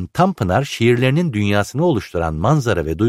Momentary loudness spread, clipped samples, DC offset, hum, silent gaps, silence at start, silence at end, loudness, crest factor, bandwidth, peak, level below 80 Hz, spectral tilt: 4 LU; under 0.1%; under 0.1%; none; none; 0 s; 0 s; -17 LUFS; 14 dB; 15 kHz; -2 dBFS; -38 dBFS; -6.5 dB/octave